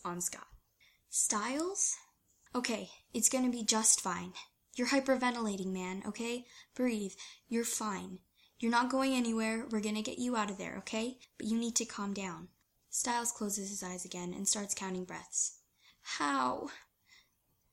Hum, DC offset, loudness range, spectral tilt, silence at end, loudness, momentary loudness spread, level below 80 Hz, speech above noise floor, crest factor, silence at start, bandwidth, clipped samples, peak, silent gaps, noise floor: none; under 0.1%; 5 LU; -2.5 dB/octave; 0.9 s; -34 LUFS; 13 LU; -72 dBFS; 40 dB; 24 dB; 0.05 s; 16.5 kHz; under 0.1%; -12 dBFS; none; -76 dBFS